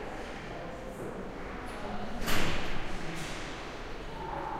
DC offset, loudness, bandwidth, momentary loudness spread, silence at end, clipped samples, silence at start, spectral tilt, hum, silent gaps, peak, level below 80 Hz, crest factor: under 0.1%; -38 LUFS; 15 kHz; 9 LU; 0 s; under 0.1%; 0 s; -4 dB/octave; none; none; -14 dBFS; -40 dBFS; 18 dB